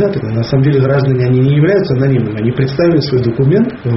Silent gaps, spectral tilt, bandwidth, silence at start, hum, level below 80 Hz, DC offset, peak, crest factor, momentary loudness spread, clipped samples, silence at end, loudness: none; -7.5 dB/octave; 6 kHz; 0 s; none; -40 dBFS; under 0.1%; 0 dBFS; 10 dB; 4 LU; under 0.1%; 0 s; -12 LUFS